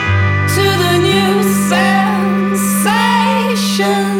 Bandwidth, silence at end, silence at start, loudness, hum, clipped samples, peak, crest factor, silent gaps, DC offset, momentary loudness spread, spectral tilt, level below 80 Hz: 18 kHz; 0 s; 0 s; -12 LUFS; none; under 0.1%; 0 dBFS; 12 dB; none; under 0.1%; 3 LU; -4.5 dB/octave; -46 dBFS